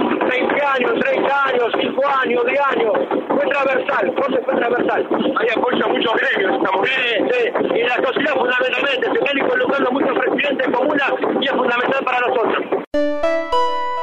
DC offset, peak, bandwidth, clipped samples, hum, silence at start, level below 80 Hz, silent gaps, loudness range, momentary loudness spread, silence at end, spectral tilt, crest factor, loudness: under 0.1%; -4 dBFS; 8.2 kHz; under 0.1%; none; 0 s; -56 dBFS; 12.87-12.91 s; 1 LU; 2 LU; 0 s; -5 dB/octave; 14 dB; -17 LUFS